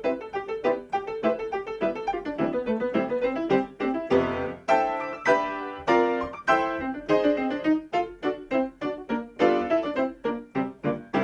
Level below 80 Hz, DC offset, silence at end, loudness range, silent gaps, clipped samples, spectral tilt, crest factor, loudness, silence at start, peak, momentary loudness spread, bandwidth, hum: -56 dBFS; under 0.1%; 0 s; 3 LU; none; under 0.1%; -6.5 dB/octave; 18 dB; -26 LUFS; 0 s; -8 dBFS; 8 LU; 9.4 kHz; none